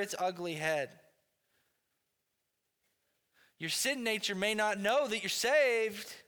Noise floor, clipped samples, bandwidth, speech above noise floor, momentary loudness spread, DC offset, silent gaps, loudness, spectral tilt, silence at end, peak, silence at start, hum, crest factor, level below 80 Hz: -83 dBFS; under 0.1%; over 20 kHz; 50 dB; 9 LU; under 0.1%; none; -32 LUFS; -2.5 dB/octave; 0.05 s; -18 dBFS; 0 s; none; 18 dB; -80 dBFS